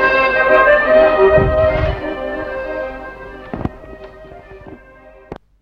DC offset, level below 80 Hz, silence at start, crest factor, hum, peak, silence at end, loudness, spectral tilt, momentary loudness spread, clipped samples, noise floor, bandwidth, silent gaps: under 0.1%; -30 dBFS; 0 s; 16 dB; none; 0 dBFS; 0.25 s; -14 LUFS; -7.5 dB/octave; 25 LU; under 0.1%; -42 dBFS; 6.2 kHz; none